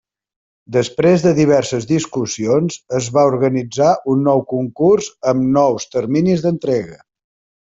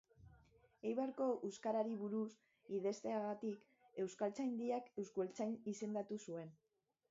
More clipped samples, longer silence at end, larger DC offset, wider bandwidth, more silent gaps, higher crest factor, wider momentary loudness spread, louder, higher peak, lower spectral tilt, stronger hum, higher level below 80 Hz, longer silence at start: neither; first, 0.7 s vs 0.55 s; neither; about the same, 8 kHz vs 7.6 kHz; neither; about the same, 14 dB vs 18 dB; about the same, 7 LU vs 8 LU; first, -16 LUFS vs -44 LUFS; first, -2 dBFS vs -28 dBFS; about the same, -6 dB/octave vs -6.5 dB/octave; neither; first, -54 dBFS vs -82 dBFS; first, 0.7 s vs 0.2 s